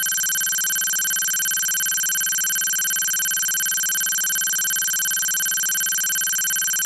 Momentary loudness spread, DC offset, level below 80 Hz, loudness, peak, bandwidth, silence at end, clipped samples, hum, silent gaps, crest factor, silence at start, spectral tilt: 0 LU; under 0.1%; -68 dBFS; -19 LUFS; -8 dBFS; 17 kHz; 0 s; under 0.1%; none; none; 12 dB; 0 s; 3.5 dB/octave